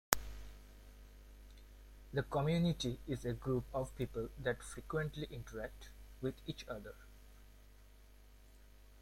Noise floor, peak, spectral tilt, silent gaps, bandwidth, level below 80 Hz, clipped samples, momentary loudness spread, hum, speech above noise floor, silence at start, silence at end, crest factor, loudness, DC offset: -61 dBFS; -6 dBFS; -5 dB/octave; none; 16.5 kHz; -54 dBFS; under 0.1%; 24 LU; 50 Hz at -55 dBFS; 21 dB; 0.1 s; 0 s; 36 dB; -41 LUFS; under 0.1%